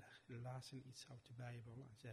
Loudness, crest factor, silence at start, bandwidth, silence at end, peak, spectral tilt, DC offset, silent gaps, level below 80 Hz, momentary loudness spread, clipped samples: -56 LUFS; 14 dB; 0 s; 13 kHz; 0 s; -40 dBFS; -5.5 dB/octave; under 0.1%; none; -82 dBFS; 6 LU; under 0.1%